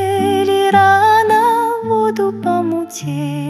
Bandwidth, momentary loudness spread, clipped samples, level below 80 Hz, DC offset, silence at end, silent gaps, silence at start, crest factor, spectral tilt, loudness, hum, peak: 14.5 kHz; 11 LU; under 0.1%; -62 dBFS; under 0.1%; 0 s; none; 0 s; 14 dB; -5 dB/octave; -14 LUFS; none; 0 dBFS